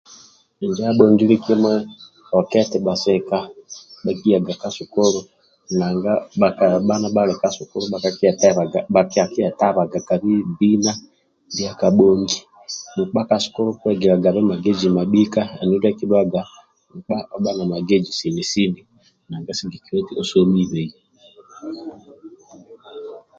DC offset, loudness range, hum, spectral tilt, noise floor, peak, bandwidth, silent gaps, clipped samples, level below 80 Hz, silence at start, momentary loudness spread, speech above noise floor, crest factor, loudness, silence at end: under 0.1%; 5 LU; none; -6 dB/octave; -50 dBFS; 0 dBFS; 7.6 kHz; none; under 0.1%; -56 dBFS; 0.1 s; 16 LU; 32 dB; 18 dB; -19 LUFS; 0.2 s